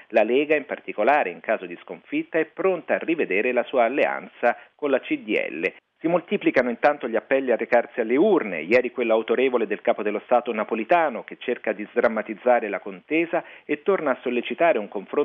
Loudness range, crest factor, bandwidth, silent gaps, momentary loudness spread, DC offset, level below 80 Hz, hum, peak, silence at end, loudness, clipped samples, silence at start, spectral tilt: 2 LU; 16 dB; 6.2 kHz; none; 8 LU; under 0.1%; -70 dBFS; none; -6 dBFS; 0 s; -23 LUFS; under 0.1%; 0.1 s; -7.5 dB/octave